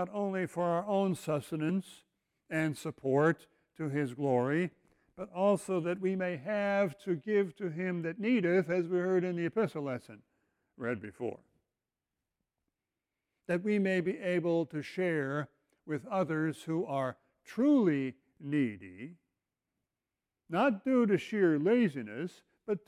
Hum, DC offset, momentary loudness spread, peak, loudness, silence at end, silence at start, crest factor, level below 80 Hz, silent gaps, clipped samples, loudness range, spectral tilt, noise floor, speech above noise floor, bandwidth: none; under 0.1%; 12 LU; -16 dBFS; -32 LUFS; 0.1 s; 0 s; 16 dB; -76 dBFS; none; under 0.1%; 5 LU; -7.5 dB/octave; under -90 dBFS; over 58 dB; 16 kHz